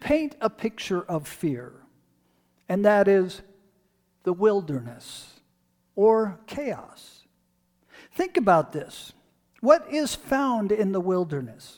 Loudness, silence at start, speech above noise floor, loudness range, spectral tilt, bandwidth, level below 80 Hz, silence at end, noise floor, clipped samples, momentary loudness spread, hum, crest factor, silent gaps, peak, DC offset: -24 LUFS; 0 s; 45 dB; 4 LU; -6 dB/octave; 19 kHz; -58 dBFS; 0.05 s; -69 dBFS; under 0.1%; 18 LU; 60 Hz at -55 dBFS; 22 dB; none; -4 dBFS; under 0.1%